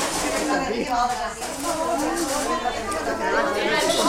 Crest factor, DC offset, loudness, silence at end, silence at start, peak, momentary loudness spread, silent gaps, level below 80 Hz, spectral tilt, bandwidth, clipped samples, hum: 16 dB; under 0.1%; -24 LUFS; 0 s; 0 s; -8 dBFS; 5 LU; none; -44 dBFS; -2.5 dB/octave; 16.5 kHz; under 0.1%; none